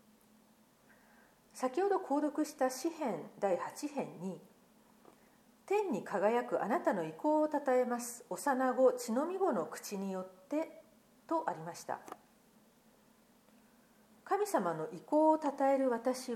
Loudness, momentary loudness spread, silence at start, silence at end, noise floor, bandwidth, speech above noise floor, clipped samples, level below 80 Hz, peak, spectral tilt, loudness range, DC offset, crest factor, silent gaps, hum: -35 LUFS; 13 LU; 1.55 s; 0 s; -66 dBFS; 16 kHz; 32 dB; under 0.1%; -86 dBFS; -16 dBFS; -5 dB/octave; 10 LU; under 0.1%; 20 dB; none; none